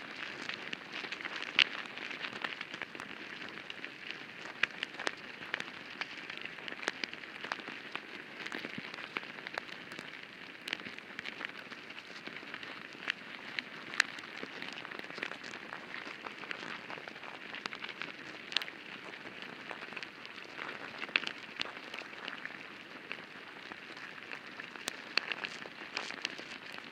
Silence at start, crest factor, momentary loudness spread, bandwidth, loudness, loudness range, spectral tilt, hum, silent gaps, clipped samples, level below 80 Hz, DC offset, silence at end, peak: 0 s; 38 dB; 11 LU; 16 kHz; -40 LUFS; 7 LU; -2 dB/octave; none; none; under 0.1%; -82 dBFS; under 0.1%; 0 s; -4 dBFS